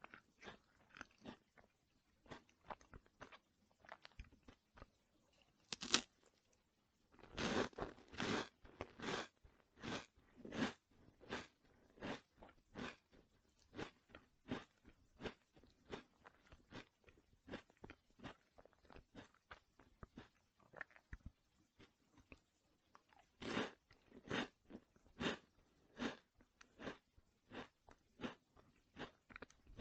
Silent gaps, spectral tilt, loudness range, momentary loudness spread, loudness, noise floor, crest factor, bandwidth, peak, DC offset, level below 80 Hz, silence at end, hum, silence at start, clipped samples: none; -3 dB/octave; 15 LU; 21 LU; -50 LUFS; -81 dBFS; 42 dB; 8.8 kHz; -10 dBFS; under 0.1%; -72 dBFS; 0 s; none; 0.05 s; under 0.1%